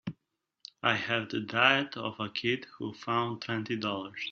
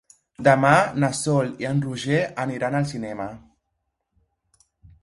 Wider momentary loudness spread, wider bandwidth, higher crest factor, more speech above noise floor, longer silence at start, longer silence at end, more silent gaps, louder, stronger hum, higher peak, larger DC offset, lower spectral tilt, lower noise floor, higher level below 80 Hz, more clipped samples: about the same, 15 LU vs 13 LU; second, 7 kHz vs 11.5 kHz; about the same, 24 dB vs 22 dB; second, 50 dB vs 55 dB; second, 0.05 s vs 0.4 s; second, 0 s vs 1.65 s; neither; second, -30 LUFS vs -22 LUFS; neither; second, -8 dBFS vs -2 dBFS; neither; second, -2 dB/octave vs -5.5 dB/octave; first, -82 dBFS vs -77 dBFS; second, -72 dBFS vs -58 dBFS; neither